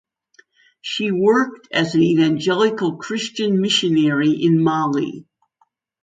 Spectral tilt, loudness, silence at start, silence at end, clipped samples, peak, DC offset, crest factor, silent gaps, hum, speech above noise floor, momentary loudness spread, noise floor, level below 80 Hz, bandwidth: -5.5 dB/octave; -18 LUFS; 0.85 s; 0.8 s; under 0.1%; -4 dBFS; under 0.1%; 16 dB; none; none; 47 dB; 9 LU; -65 dBFS; -64 dBFS; 9.4 kHz